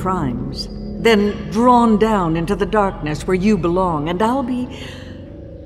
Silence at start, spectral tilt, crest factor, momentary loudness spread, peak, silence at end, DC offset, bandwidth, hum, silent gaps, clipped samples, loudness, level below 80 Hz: 0 s; -6.5 dB/octave; 16 dB; 18 LU; -2 dBFS; 0 s; under 0.1%; 13.5 kHz; none; none; under 0.1%; -17 LUFS; -34 dBFS